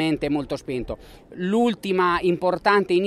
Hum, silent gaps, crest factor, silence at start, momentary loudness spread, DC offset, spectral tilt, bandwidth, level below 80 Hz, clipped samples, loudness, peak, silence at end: none; none; 18 dB; 0 s; 13 LU; under 0.1%; -6 dB/octave; 13 kHz; -48 dBFS; under 0.1%; -22 LUFS; -4 dBFS; 0 s